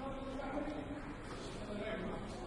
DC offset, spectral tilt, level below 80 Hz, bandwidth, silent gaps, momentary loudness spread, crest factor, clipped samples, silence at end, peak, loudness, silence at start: under 0.1%; -6 dB/octave; -52 dBFS; 11.5 kHz; none; 5 LU; 16 dB; under 0.1%; 0 s; -28 dBFS; -44 LUFS; 0 s